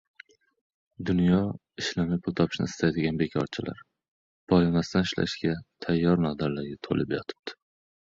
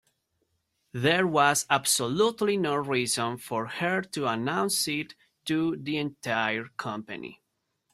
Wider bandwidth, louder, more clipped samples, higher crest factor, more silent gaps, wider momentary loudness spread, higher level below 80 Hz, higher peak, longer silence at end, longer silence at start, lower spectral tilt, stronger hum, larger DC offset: second, 7.6 kHz vs 16 kHz; about the same, -27 LUFS vs -27 LUFS; neither; about the same, 18 dB vs 20 dB; first, 4.08-4.47 s vs none; about the same, 12 LU vs 13 LU; first, -50 dBFS vs -70 dBFS; about the same, -8 dBFS vs -8 dBFS; about the same, 0.55 s vs 0.6 s; about the same, 1 s vs 0.95 s; first, -6.5 dB/octave vs -3.5 dB/octave; neither; neither